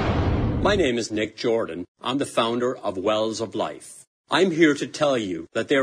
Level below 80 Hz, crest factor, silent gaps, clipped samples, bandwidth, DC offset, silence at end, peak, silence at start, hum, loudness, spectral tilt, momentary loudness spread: -38 dBFS; 20 dB; 1.88-1.95 s, 4.07-4.24 s; under 0.1%; 11 kHz; under 0.1%; 0 s; -4 dBFS; 0 s; none; -23 LUFS; -5 dB/octave; 9 LU